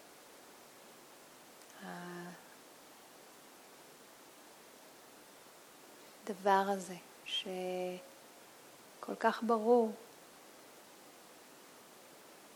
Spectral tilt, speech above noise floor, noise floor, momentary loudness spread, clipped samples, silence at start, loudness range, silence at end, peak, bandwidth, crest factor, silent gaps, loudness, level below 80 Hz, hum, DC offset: -4 dB/octave; 24 dB; -58 dBFS; 24 LU; under 0.1%; 0 s; 19 LU; 0 s; -16 dBFS; over 20 kHz; 24 dB; none; -36 LUFS; under -90 dBFS; none; under 0.1%